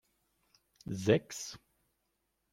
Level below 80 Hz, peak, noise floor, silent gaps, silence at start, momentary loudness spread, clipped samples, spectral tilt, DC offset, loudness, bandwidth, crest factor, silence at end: -70 dBFS; -12 dBFS; -81 dBFS; none; 0.85 s; 20 LU; under 0.1%; -5.5 dB/octave; under 0.1%; -34 LUFS; 16.5 kHz; 26 dB; 0.95 s